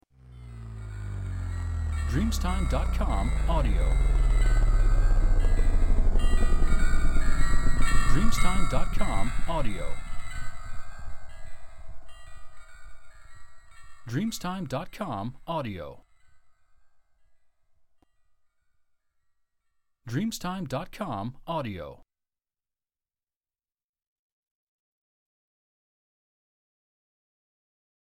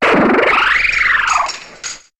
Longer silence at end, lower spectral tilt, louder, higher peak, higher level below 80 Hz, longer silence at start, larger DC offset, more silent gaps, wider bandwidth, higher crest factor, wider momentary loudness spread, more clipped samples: first, 6.05 s vs 0.25 s; first, -5.5 dB/octave vs -3 dB/octave; second, -30 LUFS vs -12 LUFS; second, -8 dBFS vs -2 dBFS; first, -28 dBFS vs -40 dBFS; first, 0.4 s vs 0 s; neither; neither; second, 10.5 kHz vs 12.5 kHz; about the same, 16 dB vs 12 dB; first, 18 LU vs 15 LU; neither